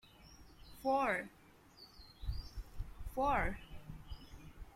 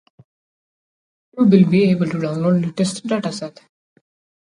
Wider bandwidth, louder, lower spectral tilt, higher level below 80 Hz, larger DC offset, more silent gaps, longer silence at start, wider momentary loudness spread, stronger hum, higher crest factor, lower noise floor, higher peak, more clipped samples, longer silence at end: first, 16.5 kHz vs 10.5 kHz; second, -39 LUFS vs -17 LUFS; about the same, -6 dB/octave vs -7 dB/octave; first, -50 dBFS vs -62 dBFS; neither; neither; second, 0.05 s vs 1.35 s; first, 24 LU vs 16 LU; neither; about the same, 20 dB vs 18 dB; second, -61 dBFS vs under -90 dBFS; second, -22 dBFS vs 0 dBFS; neither; second, 0 s vs 1 s